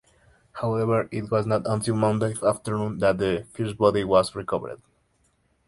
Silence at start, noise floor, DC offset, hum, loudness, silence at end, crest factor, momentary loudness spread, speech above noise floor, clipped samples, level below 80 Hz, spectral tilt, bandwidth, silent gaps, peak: 0.55 s; -67 dBFS; under 0.1%; none; -24 LUFS; 0.95 s; 20 dB; 9 LU; 43 dB; under 0.1%; -52 dBFS; -6.5 dB/octave; 11.5 kHz; none; -4 dBFS